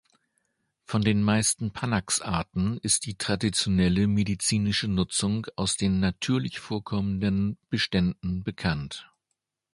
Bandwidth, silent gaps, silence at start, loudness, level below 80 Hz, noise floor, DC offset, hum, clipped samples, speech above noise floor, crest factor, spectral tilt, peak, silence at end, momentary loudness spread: 11.5 kHz; none; 0.9 s; -26 LUFS; -46 dBFS; -82 dBFS; under 0.1%; none; under 0.1%; 56 dB; 18 dB; -4.5 dB/octave; -8 dBFS; 0.7 s; 7 LU